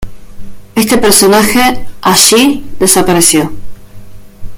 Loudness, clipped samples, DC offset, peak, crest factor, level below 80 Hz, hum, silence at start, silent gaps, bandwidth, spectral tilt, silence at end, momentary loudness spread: -7 LUFS; 0.9%; under 0.1%; 0 dBFS; 10 dB; -32 dBFS; none; 0 s; none; over 20 kHz; -2.5 dB/octave; 0 s; 9 LU